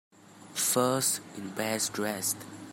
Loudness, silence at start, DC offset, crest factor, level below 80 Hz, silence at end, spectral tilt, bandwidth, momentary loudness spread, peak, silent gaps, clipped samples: -29 LUFS; 0.3 s; under 0.1%; 20 dB; -76 dBFS; 0 s; -2.5 dB/octave; 16.5 kHz; 11 LU; -12 dBFS; none; under 0.1%